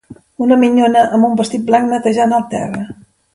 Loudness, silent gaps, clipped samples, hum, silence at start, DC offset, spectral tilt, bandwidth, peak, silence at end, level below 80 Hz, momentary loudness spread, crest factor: -13 LUFS; none; under 0.1%; none; 0.1 s; under 0.1%; -6 dB/octave; 11.5 kHz; 0 dBFS; 0.4 s; -54 dBFS; 11 LU; 14 dB